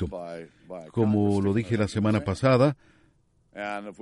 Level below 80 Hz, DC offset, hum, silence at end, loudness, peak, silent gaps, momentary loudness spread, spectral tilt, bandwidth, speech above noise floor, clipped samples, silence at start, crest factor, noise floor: -54 dBFS; under 0.1%; none; 0.1 s; -25 LUFS; -8 dBFS; none; 20 LU; -7.5 dB/octave; 11.5 kHz; 38 dB; under 0.1%; 0 s; 18 dB; -64 dBFS